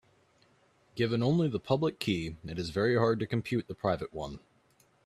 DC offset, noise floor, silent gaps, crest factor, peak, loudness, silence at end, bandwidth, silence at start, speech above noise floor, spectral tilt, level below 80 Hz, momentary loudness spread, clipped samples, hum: under 0.1%; -67 dBFS; none; 20 dB; -12 dBFS; -31 LUFS; 0.7 s; 14 kHz; 0.95 s; 37 dB; -7 dB/octave; -60 dBFS; 12 LU; under 0.1%; none